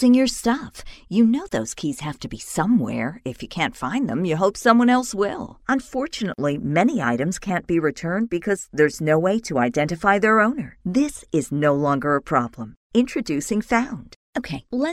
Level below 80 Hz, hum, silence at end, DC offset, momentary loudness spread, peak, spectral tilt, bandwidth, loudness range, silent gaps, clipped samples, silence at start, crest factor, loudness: -48 dBFS; none; 0 s; under 0.1%; 12 LU; 0 dBFS; -5.5 dB/octave; 14 kHz; 3 LU; 12.77-12.90 s, 14.16-14.33 s; under 0.1%; 0 s; 20 dB; -22 LUFS